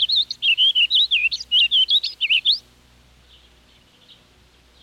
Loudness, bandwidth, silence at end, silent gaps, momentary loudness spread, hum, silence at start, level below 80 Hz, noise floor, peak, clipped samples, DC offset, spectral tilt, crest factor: -16 LUFS; 16 kHz; 2.25 s; none; 4 LU; none; 0 s; -58 dBFS; -54 dBFS; -10 dBFS; under 0.1%; under 0.1%; 2 dB/octave; 12 dB